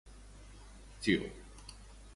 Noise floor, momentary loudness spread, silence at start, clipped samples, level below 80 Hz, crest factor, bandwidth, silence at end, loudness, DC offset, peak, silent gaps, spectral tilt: -53 dBFS; 23 LU; 0.05 s; under 0.1%; -54 dBFS; 24 dB; 11.5 kHz; 0 s; -35 LUFS; under 0.1%; -16 dBFS; none; -5 dB/octave